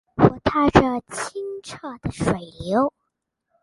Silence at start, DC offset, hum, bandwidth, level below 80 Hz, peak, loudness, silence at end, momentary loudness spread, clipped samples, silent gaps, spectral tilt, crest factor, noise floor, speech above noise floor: 0.15 s; under 0.1%; none; 11.5 kHz; -42 dBFS; 0 dBFS; -22 LUFS; 0.75 s; 15 LU; under 0.1%; none; -6.5 dB/octave; 22 dB; -78 dBFS; 56 dB